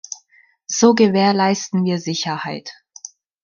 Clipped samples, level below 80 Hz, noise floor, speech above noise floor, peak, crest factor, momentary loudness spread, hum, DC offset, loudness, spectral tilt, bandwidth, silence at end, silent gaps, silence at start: under 0.1%; -64 dBFS; -55 dBFS; 39 dB; -2 dBFS; 16 dB; 23 LU; none; under 0.1%; -17 LUFS; -4.5 dB/octave; 7.4 kHz; 0.75 s; none; 0.1 s